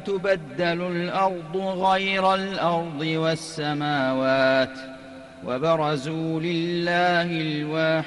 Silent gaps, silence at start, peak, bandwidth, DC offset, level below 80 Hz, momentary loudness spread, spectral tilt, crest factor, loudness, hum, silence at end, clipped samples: none; 0 s; -8 dBFS; 12 kHz; under 0.1%; -60 dBFS; 8 LU; -5.5 dB/octave; 14 dB; -24 LUFS; none; 0 s; under 0.1%